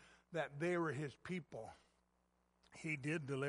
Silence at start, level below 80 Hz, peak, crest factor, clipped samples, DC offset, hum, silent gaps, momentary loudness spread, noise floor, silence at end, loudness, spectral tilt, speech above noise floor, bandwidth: 0 s; -78 dBFS; -26 dBFS; 18 dB; under 0.1%; under 0.1%; 60 Hz at -70 dBFS; none; 14 LU; -80 dBFS; 0 s; -44 LUFS; -6.5 dB/octave; 37 dB; 11.5 kHz